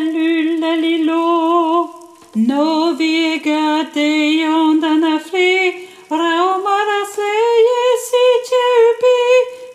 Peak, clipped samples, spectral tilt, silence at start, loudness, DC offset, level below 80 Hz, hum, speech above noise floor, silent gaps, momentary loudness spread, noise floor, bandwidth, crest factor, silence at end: -2 dBFS; under 0.1%; -3.5 dB/octave; 0 s; -14 LUFS; under 0.1%; -74 dBFS; none; 21 dB; none; 6 LU; -36 dBFS; 14.5 kHz; 12 dB; 0 s